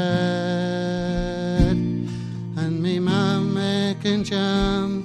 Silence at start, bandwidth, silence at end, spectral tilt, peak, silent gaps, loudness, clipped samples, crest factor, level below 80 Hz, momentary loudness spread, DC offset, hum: 0 s; 9.8 kHz; 0 s; -6.5 dB/octave; -6 dBFS; none; -23 LUFS; under 0.1%; 16 dB; -34 dBFS; 6 LU; under 0.1%; none